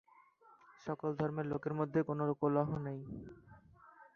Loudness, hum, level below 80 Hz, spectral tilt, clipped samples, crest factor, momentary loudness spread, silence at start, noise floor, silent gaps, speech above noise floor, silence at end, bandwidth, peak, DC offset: -37 LUFS; none; -68 dBFS; -9 dB/octave; under 0.1%; 20 dB; 15 LU; 0.7 s; -65 dBFS; none; 28 dB; 0.1 s; 6.8 kHz; -18 dBFS; under 0.1%